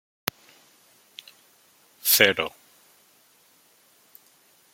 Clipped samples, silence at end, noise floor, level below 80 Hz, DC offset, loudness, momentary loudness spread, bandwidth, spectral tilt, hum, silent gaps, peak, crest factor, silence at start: under 0.1%; 2.25 s; -60 dBFS; -72 dBFS; under 0.1%; -22 LUFS; 28 LU; 16.5 kHz; -1 dB/octave; none; none; 0 dBFS; 30 dB; 2.05 s